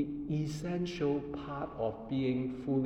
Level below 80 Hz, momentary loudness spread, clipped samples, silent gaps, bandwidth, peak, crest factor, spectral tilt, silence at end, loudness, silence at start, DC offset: -56 dBFS; 6 LU; under 0.1%; none; 11.5 kHz; -22 dBFS; 12 dB; -7.5 dB/octave; 0 s; -36 LUFS; 0 s; under 0.1%